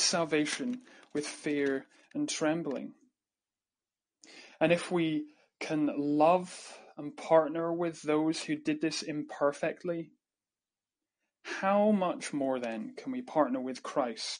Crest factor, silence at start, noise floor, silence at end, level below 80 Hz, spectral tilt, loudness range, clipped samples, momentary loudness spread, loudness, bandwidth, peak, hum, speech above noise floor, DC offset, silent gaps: 22 dB; 0 s; under -90 dBFS; 0 s; -82 dBFS; -4.5 dB/octave; 6 LU; under 0.1%; 16 LU; -31 LUFS; 10 kHz; -12 dBFS; none; over 59 dB; under 0.1%; none